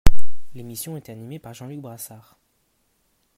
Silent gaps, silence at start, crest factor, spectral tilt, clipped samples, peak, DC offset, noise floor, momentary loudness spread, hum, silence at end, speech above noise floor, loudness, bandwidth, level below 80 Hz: none; 0.05 s; 16 dB; -5 dB/octave; 0.4%; 0 dBFS; under 0.1%; -68 dBFS; 13 LU; none; 0 s; 40 dB; -34 LUFS; 15.5 kHz; -30 dBFS